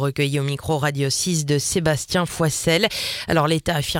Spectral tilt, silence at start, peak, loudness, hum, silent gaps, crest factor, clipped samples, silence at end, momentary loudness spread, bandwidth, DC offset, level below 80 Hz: -4 dB/octave; 0 s; -4 dBFS; -21 LUFS; none; none; 18 dB; under 0.1%; 0 s; 4 LU; 17 kHz; under 0.1%; -44 dBFS